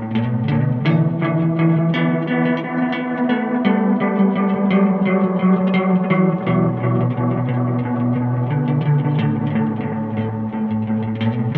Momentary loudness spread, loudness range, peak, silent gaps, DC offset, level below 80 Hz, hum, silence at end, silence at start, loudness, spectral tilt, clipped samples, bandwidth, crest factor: 5 LU; 3 LU; -4 dBFS; none; under 0.1%; -54 dBFS; none; 0 s; 0 s; -18 LUFS; -10.5 dB/octave; under 0.1%; 4.5 kHz; 14 dB